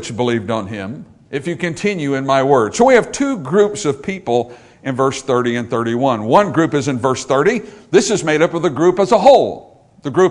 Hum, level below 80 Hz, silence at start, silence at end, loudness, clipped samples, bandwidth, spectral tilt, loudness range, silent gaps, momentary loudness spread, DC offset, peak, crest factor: none; -52 dBFS; 0 s; 0 s; -15 LUFS; 0.1%; 11 kHz; -5 dB/octave; 3 LU; none; 13 LU; under 0.1%; 0 dBFS; 16 dB